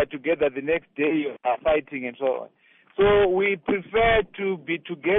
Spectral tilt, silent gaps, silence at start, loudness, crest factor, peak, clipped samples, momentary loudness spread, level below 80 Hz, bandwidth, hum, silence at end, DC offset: -3.5 dB/octave; none; 0 s; -24 LUFS; 14 dB; -10 dBFS; under 0.1%; 10 LU; -46 dBFS; 3.9 kHz; none; 0 s; under 0.1%